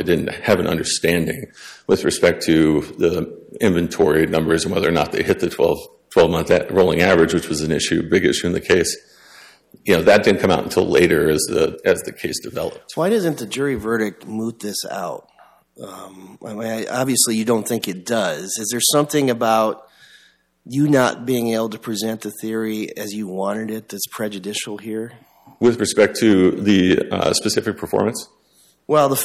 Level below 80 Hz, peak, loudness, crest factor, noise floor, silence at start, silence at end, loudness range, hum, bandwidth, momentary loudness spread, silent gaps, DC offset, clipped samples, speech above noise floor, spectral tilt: -48 dBFS; -2 dBFS; -19 LUFS; 16 dB; -57 dBFS; 0 s; 0 s; 7 LU; none; 16 kHz; 12 LU; none; under 0.1%; under 0.1%; 38 dB; -4.5 dB/octave